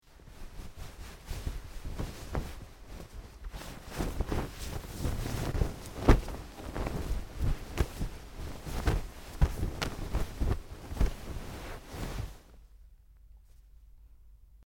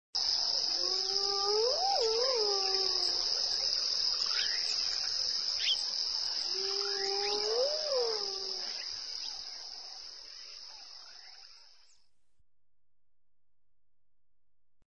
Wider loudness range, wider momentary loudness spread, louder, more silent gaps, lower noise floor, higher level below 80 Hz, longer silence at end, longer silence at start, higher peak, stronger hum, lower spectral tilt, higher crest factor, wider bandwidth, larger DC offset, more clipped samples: second, 10 LU vs 17 LU; about the same, 16 LU vs 17 LU; second, -36 LUFS vs -30 LUFS; neither; second, -56 dBFS vs -90 dBFS; first, -36 dBFS vs -70 dBFS; second, 0 s vs 3.3 s; about the same, 0.05 s vs 0.15 s; first, -6 dBFS vs -16 dBFS; neither; first, -6 dB/octave vs 1 dB/octave; first, 28 dB vs 18 dB; first, 17.5 kHz vs 10.5 kHz; second, under 0.1% vs 0.1%; neither